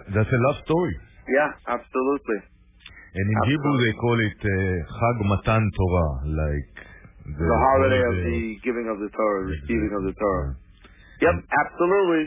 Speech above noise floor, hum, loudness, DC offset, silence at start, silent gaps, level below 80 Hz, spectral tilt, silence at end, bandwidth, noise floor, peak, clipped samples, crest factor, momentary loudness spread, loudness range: 27 dB; none; -23 LUFS; under 0.1%; 0 s; none; -36 dBFS; -11 dB/octave; 0 s; 3.8 kHz; -50 dBFS; -6 dBFS; under 0.1%; 16 dB; 10 LU; 3 LU